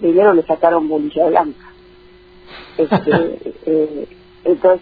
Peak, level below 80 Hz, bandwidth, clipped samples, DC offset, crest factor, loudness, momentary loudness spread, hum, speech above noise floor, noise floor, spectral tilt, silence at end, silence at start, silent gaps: 0 dBFS; -52 dBFS; 4.9 kHz; under 0.1%; under 0.1%; 16 dB; -16 LUFS; 15 LU; none; 29 dB; -44 dBFS; -10 dB/octave; 0 s; 0 s; none